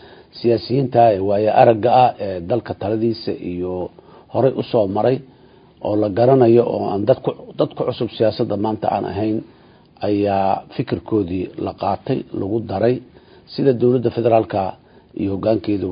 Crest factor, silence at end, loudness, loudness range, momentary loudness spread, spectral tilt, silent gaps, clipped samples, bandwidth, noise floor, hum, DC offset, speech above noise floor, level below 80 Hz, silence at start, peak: 18 dB; 0 s; -19 LUFS; 5 LU; 12 LU; -12 dB/octave; none; under 0.1%; 5.2 kHz; -48 dBFS; none; under 0.1%; 30 dB; -48 dBFS; 0.35 s; 0 dBFS